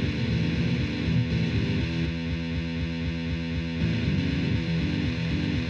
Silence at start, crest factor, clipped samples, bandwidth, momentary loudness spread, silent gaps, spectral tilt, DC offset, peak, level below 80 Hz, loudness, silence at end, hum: 0 s; 12 dB; under 0.1%; 7.2 kHz; 4 LU; none; -7 dB/octave; under 0.1%; -14 dBFS; -36 dBFS; -27 LUFS; 0 s; none